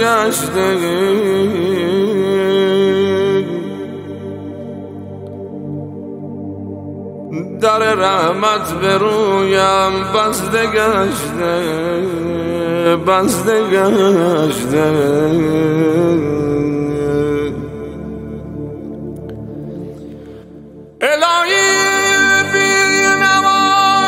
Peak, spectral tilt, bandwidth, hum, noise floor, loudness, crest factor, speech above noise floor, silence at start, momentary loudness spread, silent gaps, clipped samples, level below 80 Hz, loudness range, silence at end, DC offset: -2 dBFS; -4 dB/octave; 16 kHz; none; -36 dBFS; -14 LUFS; 14 dB; 22 dB; 0 s; 17 LU; none; under 0.1%; -44 dBFS; 12 LU; 0 s; under 0.1%